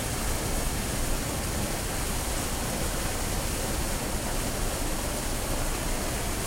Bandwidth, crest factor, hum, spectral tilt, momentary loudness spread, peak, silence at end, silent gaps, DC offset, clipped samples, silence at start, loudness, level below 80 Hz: 16 kHz; 14 dB; none; -3.5 dB/octave; 1 LU; -14 dBFS; 0 s; none; under 0.1%; under 0.1%; 0 s; -30 LUFS; -32 dBFS